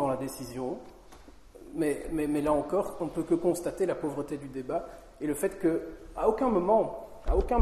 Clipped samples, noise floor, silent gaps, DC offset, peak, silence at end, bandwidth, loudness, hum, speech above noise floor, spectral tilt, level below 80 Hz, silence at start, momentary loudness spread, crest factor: under 0.1%; -51 dBFS; none; under 0.1%; -10 dBFS; 0 s; 13 kHz; -30 LUFS; none; 22 dB; -6.5 dB/octave; -42 dBFS; 0 s; 11 LU; 20 dB